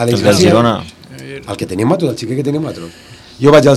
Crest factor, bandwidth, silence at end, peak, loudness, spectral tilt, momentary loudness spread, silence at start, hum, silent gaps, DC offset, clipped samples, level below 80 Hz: 12 dB; 15.5 kHz; 0 s; 0 dBFS; -13 LUFS; -6 dB/octave; 21 LU; 0 s; none; none; under 0.1%; 1%; -44 dBFS